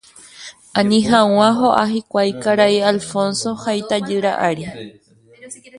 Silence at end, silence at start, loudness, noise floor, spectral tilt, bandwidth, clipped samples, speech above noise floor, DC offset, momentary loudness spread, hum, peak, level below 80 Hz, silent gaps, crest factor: 0 s; 0.35 s; -17 LUFS; -39 dBFS; -4.5 dB/octave; 11.5 kHz; under 0.1%; 23 dB; under 0.1%; 22 LU; none; 0 dBFS; -56 dBFS; none; 18 dB